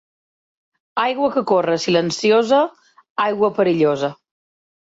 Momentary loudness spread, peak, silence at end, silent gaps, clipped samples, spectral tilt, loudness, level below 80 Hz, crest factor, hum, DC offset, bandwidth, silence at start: 8 LU; -2 dBFS; 0.85 s; 3.10-3.16 s; under 0.1%; -5 dB/octave; -18 LUFS; -64 dBFS; 16 dB; none; under 0.1%; 8 kHz; 0.95 s